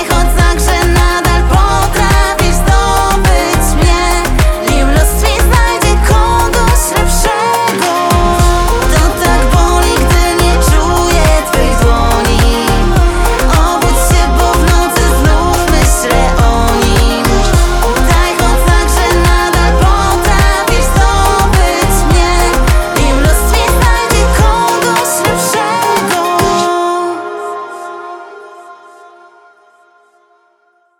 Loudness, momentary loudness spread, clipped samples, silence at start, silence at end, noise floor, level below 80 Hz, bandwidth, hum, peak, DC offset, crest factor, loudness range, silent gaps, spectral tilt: -10 LUFS; 2 LU; under 0.1%; 0 s; 2.25 s; -54 dBFS; -12 dBFS; 18 kHz; none; 0 dBFS; 0.2%; 10 dB; 2 LU; none; -4.5 dB/octave